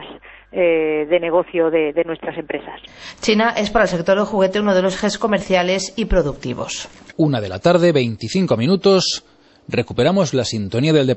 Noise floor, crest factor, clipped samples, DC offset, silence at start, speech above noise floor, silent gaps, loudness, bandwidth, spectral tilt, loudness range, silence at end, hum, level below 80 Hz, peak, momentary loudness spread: -39 dBFS; 16 dB; under 0.1%; under 0.1%; 0 s; 22 dB; none; -18 LUFS; 8.4 kHz; -5.5 dB/octave; 2 LU; 0 s; none; -38 dBFS; -2 dBFS; 12 LU